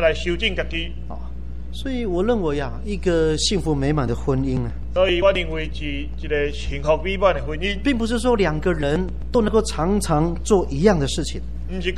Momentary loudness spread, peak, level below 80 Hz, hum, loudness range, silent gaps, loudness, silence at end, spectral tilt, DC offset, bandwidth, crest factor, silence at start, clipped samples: 10 LU; -2 dBFS; -30 dBFS; none; 3 LU; none; -21 LUFS; 0 s; -5.5 dB/octave; 3%; 12.5 kHz; 18 dB; 0 s; under 0.1%